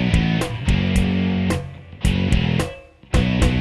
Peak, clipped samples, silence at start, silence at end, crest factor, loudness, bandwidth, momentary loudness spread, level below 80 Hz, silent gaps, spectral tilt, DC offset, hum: -4 dBFS; under 0.1%; 0 s; 0 s; 16 dB; -21 LUFS; 13 kHz; 8 LU; -26 dBFS; none; -6 dB/octave; under 0.1%; none